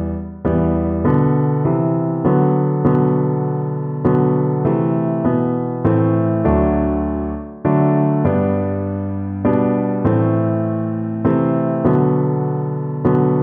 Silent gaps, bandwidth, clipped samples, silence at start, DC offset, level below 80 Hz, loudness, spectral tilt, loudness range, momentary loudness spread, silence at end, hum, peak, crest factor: none; 3.5 kHz; under 0.1%; 0 s; under 0.1%; -34 dBFS; -17 LUFS; -13 dB/octave; 1 LU; 6 LU; 0 s; none; -2 dBFS; 14 dB